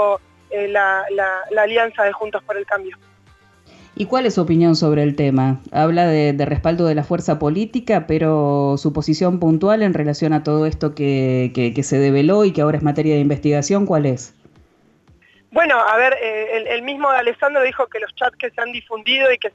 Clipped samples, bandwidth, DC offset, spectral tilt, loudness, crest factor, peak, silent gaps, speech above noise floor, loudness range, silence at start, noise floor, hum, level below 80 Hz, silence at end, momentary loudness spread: under 0.1%; 8.2 kHz; under 0.1%; -6 dB/octave; -17 LUFS; 12 dB; -4 dBFS; none; 37 dB; 3 LU; 0 s; -54 dBFS; none; -44 dBFS; 0.05 s; 8 LU